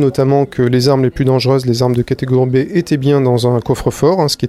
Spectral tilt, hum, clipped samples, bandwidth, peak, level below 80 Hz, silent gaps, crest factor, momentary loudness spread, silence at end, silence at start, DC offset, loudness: -6.5 dB/octave; none; under 0.1%; 14 kHz; 0 dBFS; -38 dBFS; none; 12 dB; 3 LU; 0 s; 0 s; under 0.1%; -13 LUFS